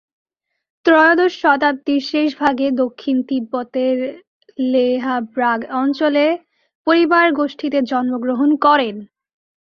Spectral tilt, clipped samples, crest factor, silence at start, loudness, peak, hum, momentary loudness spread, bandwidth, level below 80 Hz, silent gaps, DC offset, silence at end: -5 dB/octave; under 0.1%; 16 dB; 0.85 s; -17 LUFS; -2 dBFS; none; 9 LU; 6.8 kHz; -64 dBFS; 4.27-4.41 s, 6.75-6.85 s; under 0.1%; 0.65 s